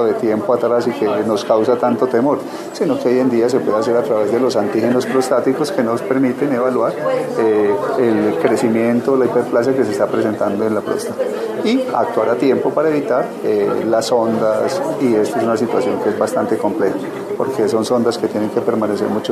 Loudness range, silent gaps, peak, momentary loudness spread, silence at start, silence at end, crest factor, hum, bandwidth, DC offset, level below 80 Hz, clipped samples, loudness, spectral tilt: 2 LU; none; 0 dBFS; 4 LU; 0 s; 0 s; 16 dB; none; 14 kHz; under 0.1%; -64 dBFS; under 0.1%; -16 LUFS; -6 dB/octave